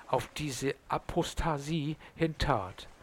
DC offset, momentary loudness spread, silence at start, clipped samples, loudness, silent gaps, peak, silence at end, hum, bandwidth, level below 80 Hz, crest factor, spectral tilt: under 0.1%; 5 LU; 0 s; under 0.1%; -34 LUFS; none; -12 dBFS; 0.05 s; none; 17 kHz; -44 dBFS; 22 dB; -5 dB/octave